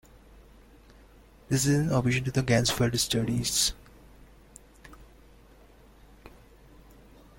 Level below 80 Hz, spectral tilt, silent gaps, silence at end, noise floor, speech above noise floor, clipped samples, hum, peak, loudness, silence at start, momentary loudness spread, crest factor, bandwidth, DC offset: -50 dBFS; -4 dB/octave; none; 1.1 s; -55 dBFS; 29 dB; under 0.1%; none; -10 dBFS; -26 LUFS; 1.5 s; 3 LU; 20 dB; 16.5 kHz; under 0.1%